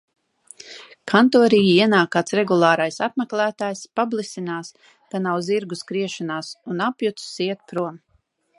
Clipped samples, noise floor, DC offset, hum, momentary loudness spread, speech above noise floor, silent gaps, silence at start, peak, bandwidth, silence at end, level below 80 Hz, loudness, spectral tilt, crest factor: under 0.1%; -65 dBFS; under 0.1%; none; 16 LU; 45 dB; none; 0.65 s; -2 dBFS; 11.5 kHz; 0.6 s; -68 dBFS; -21 LUFS; -5 dB/octave; 20 dB